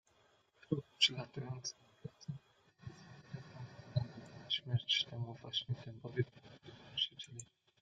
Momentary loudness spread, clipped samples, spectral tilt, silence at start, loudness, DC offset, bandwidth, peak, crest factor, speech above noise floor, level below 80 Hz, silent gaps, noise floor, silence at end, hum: 22 LU; under 0.1%; -4 dB/octave; 0.7 s; -39 LUFS; under 0.1%; 9.2 kHz; -16 dBFS; 26 dB; 32 dB; -74 dBFS; none; -72 dBFS; 0.35 s; none